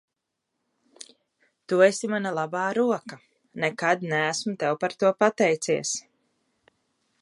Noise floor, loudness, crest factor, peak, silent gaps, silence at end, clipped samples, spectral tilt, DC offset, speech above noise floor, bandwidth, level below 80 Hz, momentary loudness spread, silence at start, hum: -82 dBFS; -25 LUFS; 22 dB; -6 dBFS; none; 1.2 s; under 0.1%; -4 dB/octave; under 0.1%; 58 dB; 11.5 kHz; -78 dBFS; 11 LU; 1.7 s; none